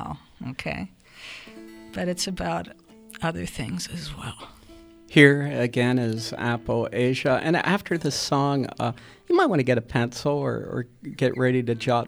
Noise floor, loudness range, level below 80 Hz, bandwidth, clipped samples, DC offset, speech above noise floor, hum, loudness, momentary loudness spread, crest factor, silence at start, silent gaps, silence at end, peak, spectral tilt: -48 dBFS; 10 LU; -52 dBFS; over 20 kHz; under 0.1%; under 0.1%; 24 dB; none; -24 LUFS; 19 LU; 24 dB; 0 s; none; 0 s; 0 dBFS; -5.5 dB/octave